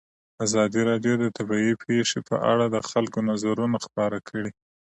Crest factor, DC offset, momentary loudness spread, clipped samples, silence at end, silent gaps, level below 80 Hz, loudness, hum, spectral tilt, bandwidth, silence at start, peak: 16 dB; under 0.1%; 6 LU; under 0.1%; 0.4 s; none; -64 dBFS; -25 LUFS; none; -5 dB/octave; 8.8 kHz; 0.4 s; -8 dBFS